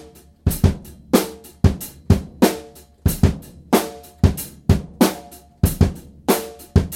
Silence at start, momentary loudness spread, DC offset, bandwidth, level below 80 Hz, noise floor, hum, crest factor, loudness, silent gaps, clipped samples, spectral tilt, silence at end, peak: 0.45 s; 11 LU; under 0.1%; 16.5 kHz; -28 dBFS; -40 dBFS; none; 20 dB; -20 LUFS; none; under 0.1%; -6 dB/octave; 0 s; 0 dBFS